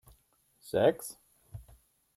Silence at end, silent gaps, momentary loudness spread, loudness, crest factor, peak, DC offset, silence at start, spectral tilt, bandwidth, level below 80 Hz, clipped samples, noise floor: 0.55 s; none; 24 LU; -30 LUFS; 22 dB; -12 dBFS; under 0.1%; 0.65 s; -5 dB/octave; 16 kHz; -62 dBFS; under 0.1%; -69 dBFS